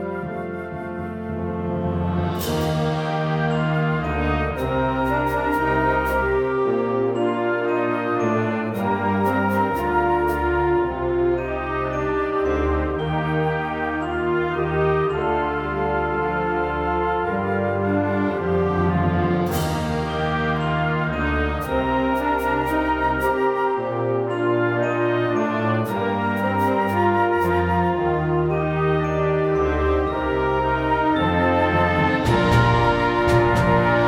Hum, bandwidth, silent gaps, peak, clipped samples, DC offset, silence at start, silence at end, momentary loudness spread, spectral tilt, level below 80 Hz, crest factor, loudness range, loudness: none; 17.5 kHz; none; -6 dBFS; under 0.1%; under 0.1%; 0 s; 0 s; 5 LU; -7.5 dB/octave; -36 dBFS; 16 dB; 3 LU; -21 LUFS